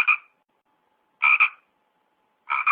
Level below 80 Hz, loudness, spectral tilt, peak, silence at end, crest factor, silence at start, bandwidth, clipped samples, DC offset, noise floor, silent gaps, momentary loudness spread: -84 dBFS; -20 LUFS; -1 dB/octave; -6 dBFS; 0 s; 18 dB; 0 s; 5 kHz; under 0.1%; under 0.1%; -70 dBFS; none; 8 LU